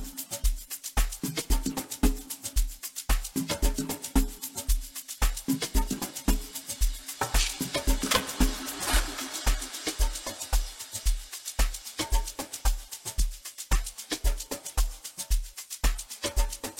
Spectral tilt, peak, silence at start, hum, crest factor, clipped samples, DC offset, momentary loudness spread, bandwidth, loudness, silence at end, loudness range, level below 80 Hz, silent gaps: -3 dB/octave; -8 dBFS; 0 s; none; 22 dB; under 0.1%; under 0.1%; 7 LU; 16.5 kHz; -31 LUFS; 0 s; 4 LU; -30 dBFS; none